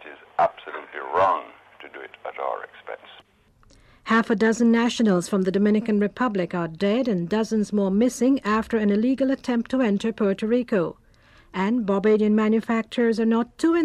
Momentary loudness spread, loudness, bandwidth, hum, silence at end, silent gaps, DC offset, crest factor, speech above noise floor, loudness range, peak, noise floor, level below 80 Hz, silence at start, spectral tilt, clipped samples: 15 LU; -22 LUFS; 12 kHz; none; 0 s; none; under 0.1%; 12 dB; 36 dB; 6 LU; -10 dBFS; -58 dBFS; -58 dBFS; 0 s; -6 dB/octave; under 0.1%